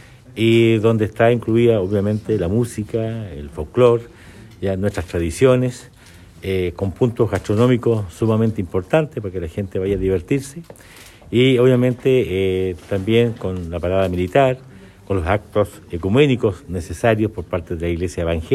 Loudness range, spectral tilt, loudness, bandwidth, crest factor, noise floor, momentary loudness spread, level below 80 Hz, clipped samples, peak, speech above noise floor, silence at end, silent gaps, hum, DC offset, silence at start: 3 LU; -7 dB/octave; -19 LUFS; 13.5 kHz; 18 dB; -43 dBFS; 11 LU; -40 dBFS; under 0.1%; -2 dBFS; 25 dB; 0 s; none; none; under 0.1%; 0.35 s